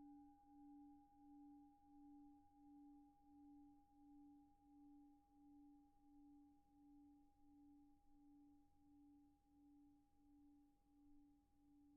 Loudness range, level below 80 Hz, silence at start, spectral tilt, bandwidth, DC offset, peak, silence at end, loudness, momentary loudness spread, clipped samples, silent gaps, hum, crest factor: 2 LU; -84 dBFS; 0 s; -2 dB/octave; 1.6 kHz; under 0.1%; -58 dBFS; 0 s; -68 LUFS; 4 LU; under 0.1%; none; none; 12 dB